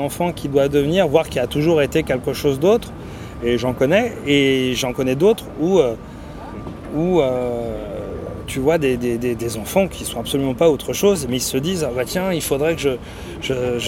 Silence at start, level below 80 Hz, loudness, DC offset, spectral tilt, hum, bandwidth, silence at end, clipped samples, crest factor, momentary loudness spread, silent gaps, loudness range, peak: 0 s; -40 dBFS; -19 LUFS; under 0.1%; -5 dB/octave; none; 17 kHz; 0 s; under 0.1%; 18 dB; 12 LU; none; 3 LU; -2 dBFS